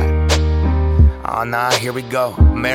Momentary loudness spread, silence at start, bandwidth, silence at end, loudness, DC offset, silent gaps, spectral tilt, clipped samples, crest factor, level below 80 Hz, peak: 6 LU; 0 s; 14.5 kHz; 0 s; -16 LUFS; under 0.1%; none; -5.5 dB/octave; under 0.1%; 14 dB; -18 dBFS; 0 dBFS